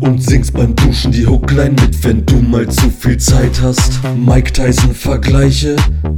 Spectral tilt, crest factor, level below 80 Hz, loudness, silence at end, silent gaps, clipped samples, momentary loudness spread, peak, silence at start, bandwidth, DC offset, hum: -5.5 dB/octave; 10 dB; -14 dBFS; -11 LUFS; 0 s; none; 0.7%; 3 LU; 0 dBFS; 0 s; 17.5 kHz; under 0.1%; none